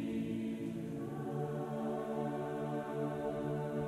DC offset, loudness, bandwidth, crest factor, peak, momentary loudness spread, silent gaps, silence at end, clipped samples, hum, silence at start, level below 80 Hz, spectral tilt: under 0.1%; -39 LUFS; 14 kHz; 14 dB; -24 dBFS; 3 LU; none; 0 s; under 0.1%; none; 0 s; -66 dBFS; -8 dB/octave